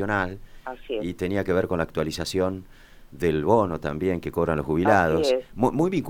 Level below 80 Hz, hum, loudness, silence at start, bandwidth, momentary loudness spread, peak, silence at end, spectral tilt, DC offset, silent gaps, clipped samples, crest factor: -44 dBFS; none; -24 LUFS; 0 s; 18.5 kHz; 11 LU; -4 dBFS; 0 s; -6.5 dB/octave; under 0.1%; none; under 0.1%; 20 dB